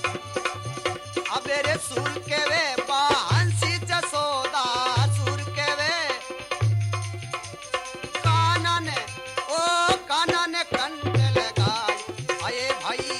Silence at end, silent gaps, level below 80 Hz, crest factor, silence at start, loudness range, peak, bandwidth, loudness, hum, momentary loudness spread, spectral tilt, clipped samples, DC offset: 0 s; none; -54 dBFS; 18 dB; 0 s; 2 LU; -6 dBFS; 12.5 kHz; -24 LUFS; none; 9 LU; -4 dB/octave; under 0.1%; under 0.1%